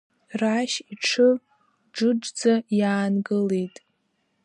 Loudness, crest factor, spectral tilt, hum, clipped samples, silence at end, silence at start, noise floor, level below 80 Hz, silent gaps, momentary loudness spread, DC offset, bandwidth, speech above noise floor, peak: -23 LUFS; 16 dB; -5 dB/octave; none; under 0.1%; 0.75 s; 0.3 s; -72 dBFS; -76 dBFS; none; 9 LU; under 0.1%; 11 kHz; 49 dB; -8 dBFS